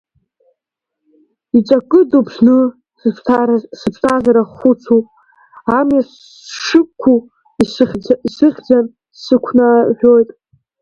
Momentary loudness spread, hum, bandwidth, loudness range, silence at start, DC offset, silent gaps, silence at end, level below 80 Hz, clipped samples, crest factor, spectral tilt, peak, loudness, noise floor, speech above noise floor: 10 LU; none; 9.6 kHz; 2 LU; 1.55 s; under 0.1%; none; 0.55 s; -52 dBFS; under 0.1%; 14 dB; -6 dB/octave; 0 dBFS; -13 LUFS; -79 dBFS; 67 dB